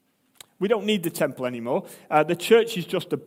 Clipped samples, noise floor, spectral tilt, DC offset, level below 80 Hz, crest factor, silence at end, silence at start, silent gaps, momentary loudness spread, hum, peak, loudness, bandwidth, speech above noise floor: under 0.1%; -53 dBFS; -5 dB/octave; under 0.1%; -74 dBFS; 20 dB; 0 s; 0.6 s; none; 10 LU; none; -4 dBFS; -24 LUFS; 16.5 kHz; 30 dB